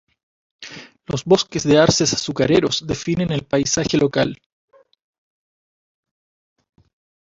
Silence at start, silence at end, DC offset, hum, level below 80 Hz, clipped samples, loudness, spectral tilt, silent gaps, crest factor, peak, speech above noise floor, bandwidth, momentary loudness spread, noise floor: 0.6 s; 3 s; under 0.1%; none; -48 dBFS; under 0.1%; -18 LUFS; -4.5 dB/octave; none; 20 dB; -2 dBFS; 20 dB; 8 kHz; 21 LU; -38 dBFS